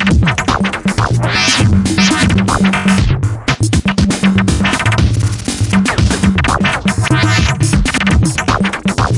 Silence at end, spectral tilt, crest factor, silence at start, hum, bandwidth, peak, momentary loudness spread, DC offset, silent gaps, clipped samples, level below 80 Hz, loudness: 0 s; -5 dB/octave; 12 dB; 0 s; none; 11.5 kHz; 0 dBFS; 4 LU; under 0.1%; none; under 0.1%; -24 dBFS; -12 LUFS